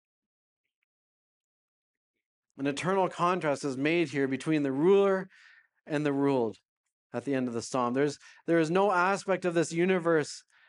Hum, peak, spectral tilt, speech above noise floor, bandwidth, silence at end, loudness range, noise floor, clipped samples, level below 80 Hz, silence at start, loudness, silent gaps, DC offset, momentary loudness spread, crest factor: none; -12 dBFS; -6 dB/octave; over 62 dB; 11 kHz; 0.3 s; 5 LU; under -90 dBFS; under 0.1%; -80 dBFS; 2.55 s; -28 LUFS; 6.65-6.84 s, 6.92-7.10 s; under 0.1%; 10 LU; 18 dB